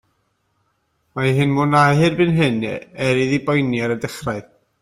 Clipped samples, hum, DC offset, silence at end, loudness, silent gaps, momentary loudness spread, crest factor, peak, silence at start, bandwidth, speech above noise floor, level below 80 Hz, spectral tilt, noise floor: under 0.1%; none; under 0.1%; 0.4 s; -18 LUFS; none; 12 LU; 16 dB; -2 dBFS; 1.15 s; 15 kHz; 49 dB; -52 dBFS; -6.5 dB/octave; -67 dBFS